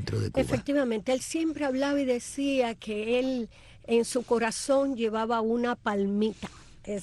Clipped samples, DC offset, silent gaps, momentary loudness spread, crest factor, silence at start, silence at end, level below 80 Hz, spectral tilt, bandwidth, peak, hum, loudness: under 0.1%; under 0.1%; none; 7 LU; 14 dB; 0 s; 0 s; -54 dBFS; -5 dB/octave; 12.5 kHz; -14 dBFS; none; -28 LUFS